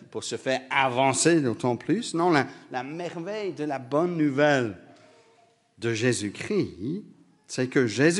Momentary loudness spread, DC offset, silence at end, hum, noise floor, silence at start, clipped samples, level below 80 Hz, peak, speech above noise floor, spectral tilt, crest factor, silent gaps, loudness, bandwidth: 12 LU; under 0.1%; 0 s; none; -61 dBFS; 0 s; under 0.1%; -70 dBFS; -6 dBFS; 36 dB; -4.5 dB/octave; 20 dB; none; -26 LUFS; 11.5 kHz